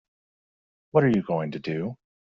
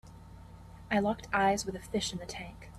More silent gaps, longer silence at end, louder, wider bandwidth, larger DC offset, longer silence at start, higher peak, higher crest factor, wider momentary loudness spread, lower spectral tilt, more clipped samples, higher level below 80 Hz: neither; first, 0.45 s vs 0 s; first, -26 LUFS vs -32 LUFS; second, 7.2 kHz vs 13.5 kHz; neither; first, 0.95 s vs 0.05 s; first, -6 dBFS vs -16 dBFS; about the same, 22 dB vs 18 dB; second, 10 LU vs 23 LU; first, -7 dB/octave vs -4 dB/octave; neither; second, -64 dBFS vs -54 dBFS